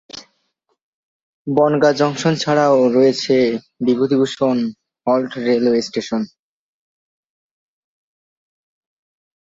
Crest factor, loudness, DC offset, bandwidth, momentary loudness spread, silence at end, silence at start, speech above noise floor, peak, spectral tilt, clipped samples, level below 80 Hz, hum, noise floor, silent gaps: 18 dB; -17 LUFS; under 0.1%; 7.8 kHz; 12 LU; 3.3 s; 0.15 s; 53 dB; -2 dBFS; -5.5 dB/octave; under 0.1%; -62 dBFS; none; -69 dBFS; 0.82-1.45 s